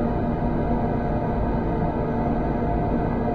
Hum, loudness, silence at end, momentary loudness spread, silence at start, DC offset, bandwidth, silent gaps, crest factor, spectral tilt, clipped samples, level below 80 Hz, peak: none; -24 LUFS; 0 s; 1 LU; 0 s; under 0.1%; 4.9 kHz; none; 12 dB; -10.5 dB/octave; under 0.1%; -30 dBFS; -12 dBFS